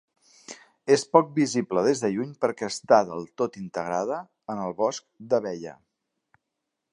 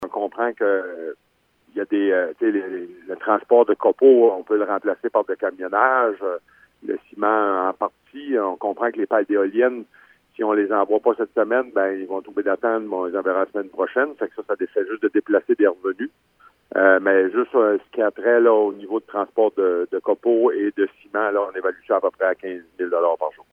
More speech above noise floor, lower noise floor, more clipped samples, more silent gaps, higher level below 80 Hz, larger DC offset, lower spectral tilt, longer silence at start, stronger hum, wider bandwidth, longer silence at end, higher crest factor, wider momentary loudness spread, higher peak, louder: first, 58 dB vs 39 dB; first, -83 dBFS vs -60 dBFS; neither; neither; about the same, -70 dBFS vs -74 dBFS; neither; second, -5 dB/octave vs -7.5 dB/octave; first, 0.5 s vs 0 s; neither; first, 11 kHz vs 3.5 kHz; first, 1.2 s vs 0.2 s; about the same, 24 dB vs 20 dB; first, 16 LU vs 12 LU; about the same, -2 dBFS vs -2 dBFS; second, -25 LUFS vs -21 LUFS